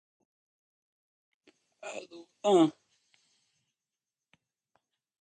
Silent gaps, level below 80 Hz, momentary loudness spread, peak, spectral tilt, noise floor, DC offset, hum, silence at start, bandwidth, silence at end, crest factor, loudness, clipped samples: none; -84 dBFS; 22 LU; -14 dBFS; -5.5 dB/octave; under -90 dBFS; under 0.1%; none; 1.85 s; 9.2 kHz; 2.5 s; 22 dB; -27 LUFS; under 0.1%